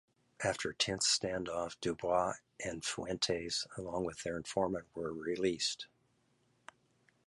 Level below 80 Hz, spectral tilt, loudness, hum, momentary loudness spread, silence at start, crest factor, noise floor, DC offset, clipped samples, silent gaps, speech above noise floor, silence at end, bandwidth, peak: -64 dBFS; -3 dB/octave; -36 LUFS; none; 9 LU; 0.4 s; 20 dB; -75 dBFS; under 0.1%; under 0.1%; none; 38 dB; 1.4 s; 11.5 kHz; -18 dBFS